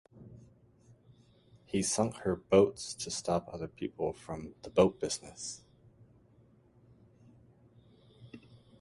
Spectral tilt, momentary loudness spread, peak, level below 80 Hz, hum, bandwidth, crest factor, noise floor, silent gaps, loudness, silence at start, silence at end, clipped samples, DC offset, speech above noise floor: -4.5 dB/octave; 27 LU; -10 dBFS; -60 dBFS; none; 11.5 kHz; 26 dB; -64 dBFS; none; -33 LUFS; 0.15 s; 0.45 s; under 0.1%; under 0.1%; 31 dB